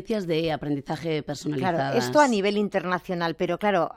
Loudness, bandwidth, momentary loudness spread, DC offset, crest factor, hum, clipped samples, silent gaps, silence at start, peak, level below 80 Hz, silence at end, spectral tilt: -25 LUFS; 16.5 kHz; 9 LU; under 0.1%; 18 dB; none; under 0.1%; none; 0 s; -6 dBFS; -56 dBFS; 0.05 s; -5.5 dB/octave